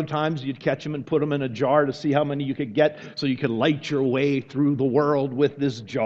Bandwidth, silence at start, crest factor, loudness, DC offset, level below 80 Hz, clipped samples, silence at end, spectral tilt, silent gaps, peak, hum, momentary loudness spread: 7.6 kHz; 0 s; 18 dB; -23 LUFS; under 0.1%; -62 dBFS; under 0.1%; 0 s; -7.5 dB/octave; none; -6 dBFS; none; 6 LU